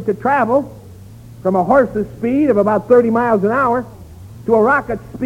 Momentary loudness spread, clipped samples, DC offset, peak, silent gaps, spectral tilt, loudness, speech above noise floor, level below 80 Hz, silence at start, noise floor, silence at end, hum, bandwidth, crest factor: 10 LU; under 0.1%; under 0.1%; 0 dBFS; none; -8.5 dB/octave; -15 LUFS; 22 dB; -44 dBFS; 0 s; -37 dBFS; 0 s; none; 15.5 kHz; 16 dB